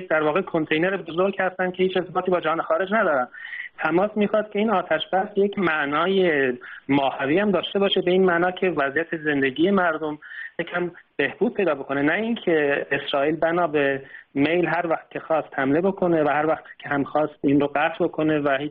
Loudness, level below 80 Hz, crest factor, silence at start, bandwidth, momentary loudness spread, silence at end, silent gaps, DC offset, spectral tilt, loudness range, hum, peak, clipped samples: -22 LUFS; -62 dBFS; 14 dB; 0 s; 5 kHz; 7 LU; 0 s; none; under 0.1%; -3.5 dB/octave; 2 LU; none; -8 dBFS; under 0.1%